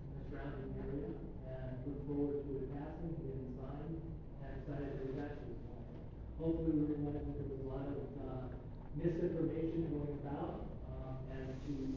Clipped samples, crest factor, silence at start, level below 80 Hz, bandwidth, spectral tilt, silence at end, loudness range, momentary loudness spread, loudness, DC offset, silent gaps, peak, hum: under 0.1%; 18 dB; 0 s; -52 dBFS; 7 kHz; -9.5 dB/octave; 0 s; 5 LU; 11 LU; -43 LUFS; under 0.1%; none; -24 dBFS; none